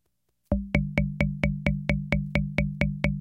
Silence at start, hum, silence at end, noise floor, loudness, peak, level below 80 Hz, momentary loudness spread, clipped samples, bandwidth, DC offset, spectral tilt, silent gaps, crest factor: 0.5 s; none; 0 s; -75 dBFS; -27 LUFS; -8 dBFS; -34 dBFS; 2 LU; under 0.1%; 8.2 kHz; under 0.1%; -8 dB/octave; none; 20 dB